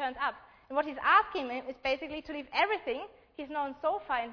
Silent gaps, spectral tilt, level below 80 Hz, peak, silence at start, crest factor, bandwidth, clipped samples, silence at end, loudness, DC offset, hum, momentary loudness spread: none; -4 dB/octave; -64 dBFS; -12 dBFS; 0 s; 20 dB; 5.4 kHz; under 0.1%; 0 s; -32 LUFS; under 0.1%; none; 14 LU